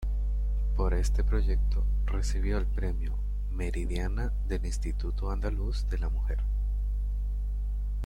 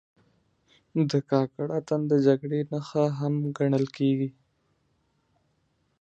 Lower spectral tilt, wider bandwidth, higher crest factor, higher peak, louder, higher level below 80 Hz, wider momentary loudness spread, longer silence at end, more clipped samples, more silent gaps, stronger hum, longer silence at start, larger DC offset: second, -6.5 dB/octave vs -8 dB/octave; first, 9.4 kHz vs 8 kHz; second, 12 dB vs 20 dB; second, -16 dBFS vs -8 dBFS; second, -32 LUFS vs -26 LUFS; first, -28 dBFS vs -72 dBFS; about the same, 5 LU vs 7 LU; second, 0 s vs 1.7 s; neither; neither; first, 50 Hz at -30 dBFS vs none; second, 0 s vs 0.95 s; neither